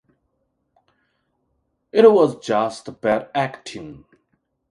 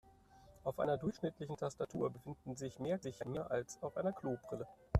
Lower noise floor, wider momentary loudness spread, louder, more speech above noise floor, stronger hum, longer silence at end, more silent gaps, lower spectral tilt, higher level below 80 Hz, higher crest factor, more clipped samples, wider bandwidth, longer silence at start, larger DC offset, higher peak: first, -71 dBFS vs -64 dBFS; first, 21 LU vs 8 LU; first, -18 LUFS vs -42 LUFS; first, 53 dB vs 22 dB; neither; first, 0.75 s vs 0 s; neither; about the same, -6 dB/octave vs -7 dB/octave; second, -62 dBFS vs -56 dBFS; about the same, 22 dB vs 24 dB; neither; second, 11 kHz vs 14 kHz; first, 1.95 s vs 0.05 s; neither; first, 0 dBFS vs -18 dBFS